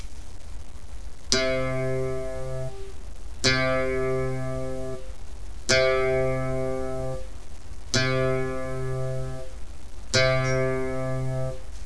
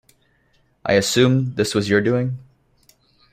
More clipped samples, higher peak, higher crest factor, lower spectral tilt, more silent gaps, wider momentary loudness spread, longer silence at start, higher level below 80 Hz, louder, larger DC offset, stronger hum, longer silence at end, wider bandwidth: neither; about the same, -2 dBFS vs -2 dBFS; first, 26 dB vs 18 dB; about the same, -4 dB/octave vs -5 dB/octave; neither; first, 22 LU vs 12 LU; second, 0 s vs 0.85 s; first, -40 dBFS vs -54 dBFS; second, -26 LUFS vs -19 LUFS; first, 3% vs under 0.1%; neither; second, 0 s vs 0.9 s; second, 11 kHz vs 15.5 kHz